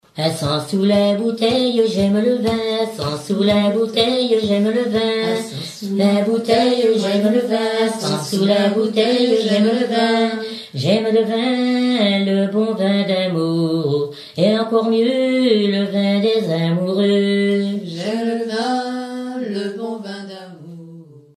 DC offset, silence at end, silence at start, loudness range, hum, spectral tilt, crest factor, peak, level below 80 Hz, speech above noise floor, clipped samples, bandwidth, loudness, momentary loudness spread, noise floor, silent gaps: under 0.1%; 0.2 s; 0.15 s; 3 LU; none; -6 dB/octave; 16 dB; -2 dBFS; -58 dBFS; 23 dB; under 0.1%; 13 kHz; -18 LUFS; 9 LU; -40 dBFS; none